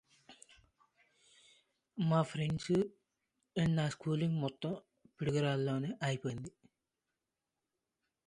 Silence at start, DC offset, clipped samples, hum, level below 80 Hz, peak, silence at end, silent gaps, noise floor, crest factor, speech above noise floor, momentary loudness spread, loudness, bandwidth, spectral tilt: 0.3 s; under 0.1%; under 0.1%; none; -68 dBFS; -18 dBFS; 1.8 s; none; -89 dBFS; 20 dB; 55 dB; 10 LU; -36 LUFS; 10.5 kHz; -7 dB/octave